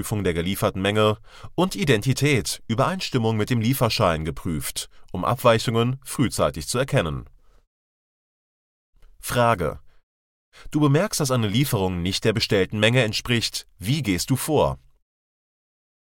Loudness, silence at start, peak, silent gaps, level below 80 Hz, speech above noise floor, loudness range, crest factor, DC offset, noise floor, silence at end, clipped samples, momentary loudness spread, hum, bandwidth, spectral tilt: -22 LUFS; 0 s; -4 dBFS; 7.67-8.93 s, 10.03-10.52 s; -44 dBFS; over 68 dB; 6 LU; 20 dB; under 0.1%; under -90 dBFS; 1.35 s; under 0.1%; 9 LU; none; 17 kHz; -5 dB/octave